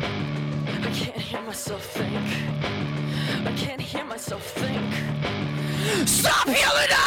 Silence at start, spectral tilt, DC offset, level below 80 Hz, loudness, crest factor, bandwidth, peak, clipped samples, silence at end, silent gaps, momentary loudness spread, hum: 0 s; -3.5 dB/octave; under 0.1%; -52 dBFS; -25 LUFS; 18 dB; 17.5 kHz; -8 dBFS; under 0.1%; 0 s; none; 12 LU; none